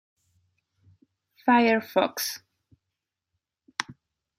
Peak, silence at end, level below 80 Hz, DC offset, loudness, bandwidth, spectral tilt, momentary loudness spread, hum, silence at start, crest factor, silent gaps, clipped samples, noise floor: -6 dBFS; 0.45 s; -78 dBFS; under 0.1%; -25 LUFS; 16 kHz; -3.5 dB/octave; 16 LU; none; 1.45 s; 24 dB; none; under 0.1%; -85 dBFS